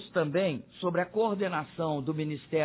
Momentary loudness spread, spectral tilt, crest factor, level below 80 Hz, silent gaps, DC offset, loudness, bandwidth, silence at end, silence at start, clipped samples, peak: 4 LU; -10.5 dB/octave; 16 dB; -68 dBFS; none; under 0.1%; -31 LUFS; 4 kHz; 0 s; 0 s; under 0.1%; -14 dBFS